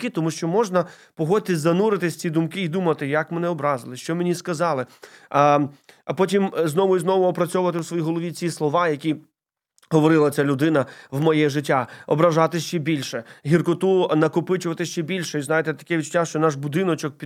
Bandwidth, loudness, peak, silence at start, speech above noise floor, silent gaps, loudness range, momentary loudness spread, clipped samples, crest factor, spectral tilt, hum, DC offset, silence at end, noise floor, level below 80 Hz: 16 kHz; -22 LUFS; -2 dBFS; 0 s; 47 dB; none; 2 LU; 8 LU; under 0.1%; 18 dB; -6 dB/octave; none; under 0.1%; 0 s; -68 dBFS; -72 dBFS